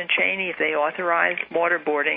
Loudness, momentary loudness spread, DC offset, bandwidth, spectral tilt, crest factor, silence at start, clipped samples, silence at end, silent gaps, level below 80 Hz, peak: -21 LUFS; 3 LU; under 0.1%; 4.6 kHz; -7 dB/octave; 18 dB; 0 s; under 0.1%; 0 s; none; -74 dBFS; -4 dBFS